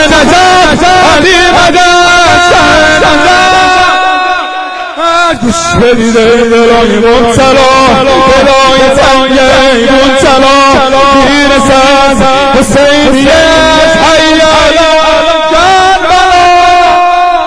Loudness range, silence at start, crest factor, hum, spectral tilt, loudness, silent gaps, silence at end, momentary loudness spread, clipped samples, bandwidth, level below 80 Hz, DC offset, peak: 3 LU; 0 s; 4 dB; none; -3.5 dB/octave; -4 LUFS; none; 0 s; 3 LU; 5%; 11 kHz; -24 dBFS; under 0.1%; 0 dBFS